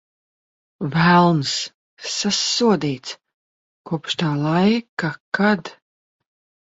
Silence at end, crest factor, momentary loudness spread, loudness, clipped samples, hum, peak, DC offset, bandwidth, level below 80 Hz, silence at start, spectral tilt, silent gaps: 0.95 s; 18 dB; 16 LU; -19 LUFS; under 0.1%; none; -2 dBFS; under 0.1%; 8 kHz; -58 dBFS; 0.8 s; -4.5 dB/octave; 1.74-1.97 s, 3.34-3.84 s, 4.89-4.97 s, 5.20-5.32 s